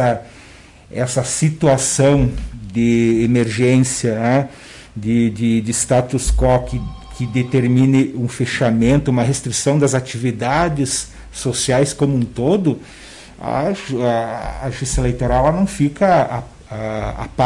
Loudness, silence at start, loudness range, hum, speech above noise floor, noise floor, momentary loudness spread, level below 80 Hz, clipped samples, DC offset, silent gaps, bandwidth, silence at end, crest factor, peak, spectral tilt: -17 LUFS; 0 s; 4 LU; none; 26 dB; -42 dBFS; 13 LU; -32 dBFS; under 0.1%; under 0.1%; none; 11.5 kHz; 0 s; 12 dB; -4 dBFS; -5.5 dB/octave